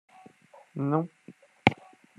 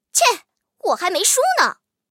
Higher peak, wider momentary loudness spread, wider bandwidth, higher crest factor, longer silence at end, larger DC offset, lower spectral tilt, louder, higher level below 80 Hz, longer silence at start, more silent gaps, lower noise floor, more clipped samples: about the same, 0 dBFS vs -2 dBFS; first, 17 LU vs 10 LU; second, 11 kHz vs 17 kHz; first, 32 dB vs 18 dB; about the same, 0.45 s vs 0.35 s; neither; first, -7 dB/octave vs 1.5 dB/octave; second, -29 LUFS vs -18 LUFS; first, -66 dBFS vs -80 dBFS; first, 0.75 s vs 0.15 s; neither; first, -55 dBFS vs -42 dBFS; neither